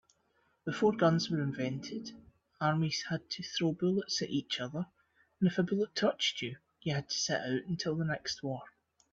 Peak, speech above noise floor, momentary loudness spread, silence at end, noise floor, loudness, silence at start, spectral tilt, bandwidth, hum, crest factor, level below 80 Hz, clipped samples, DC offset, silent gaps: -14 dBFS; 41 dB; 11 LU; 0.45 s; -74 dBFS; -34 LUFS; 0.65 s; -5 dB/octave; 7.8 kHz; none; 20 dB; -70 dBFS; under 0.1%; under 0.1%; none